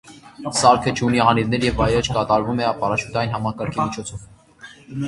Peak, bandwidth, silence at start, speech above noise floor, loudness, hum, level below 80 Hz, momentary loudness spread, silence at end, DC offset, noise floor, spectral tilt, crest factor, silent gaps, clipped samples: 0 dBFS; 11.5 kHz; 0.05 s; 25 dB; -19 LUFS; none; -40 dBFS; 15 LU; 0 s; under 0.1%; -44 dBFS; -5 dB/octave; 20 dB; none; under 0.1%